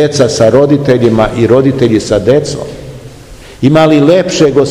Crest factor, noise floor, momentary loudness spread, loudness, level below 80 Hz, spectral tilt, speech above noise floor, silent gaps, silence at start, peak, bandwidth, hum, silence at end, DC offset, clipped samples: 8 dB; -31 dBFS; 12 LU; -8 LUFS; -34 dBFS; -6 dB/octave; 23 dB; none; 0 s; 0 dBFS; 13 kHz; none; 0 s; 0.5%; 3%